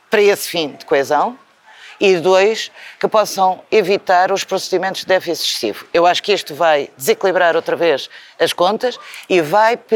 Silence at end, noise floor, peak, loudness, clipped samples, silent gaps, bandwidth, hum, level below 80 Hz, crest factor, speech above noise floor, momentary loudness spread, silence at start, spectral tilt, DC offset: 0 s; -42 dBFS; 0 dBFS; -16 LUFS; under 0.1%; none; 19 kHz; none; -70 dBFS; 16 dB; 26 dB; 8 LU; 0.1 s; -3 dB/octave; under 0.1%